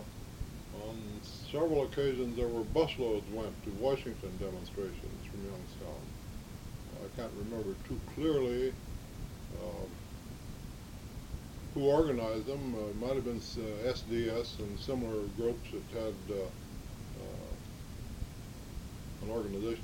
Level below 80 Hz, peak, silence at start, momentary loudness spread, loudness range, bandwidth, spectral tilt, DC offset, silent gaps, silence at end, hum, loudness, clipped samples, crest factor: -48 dBFS; -16 dBFS; 0 s; 15 LU; 9 LU; 17 kHz; -6 dB/octave; under 0.1%; none; 0 s; none; -38 LUFS; under 0.1%; 22 dB